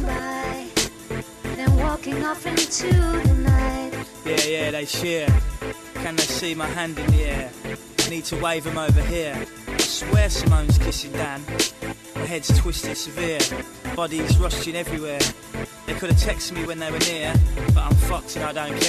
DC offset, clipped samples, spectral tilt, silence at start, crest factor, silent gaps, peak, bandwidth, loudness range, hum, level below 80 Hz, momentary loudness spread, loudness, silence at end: under 0.1%; under 0.1%; -4.5 dB/octave; 0 s; 14 dB; none; -8 dBFS; 14 kHz; 2 LU; none; -28 dBFS; 11 LU; -23 LUFS; 0 s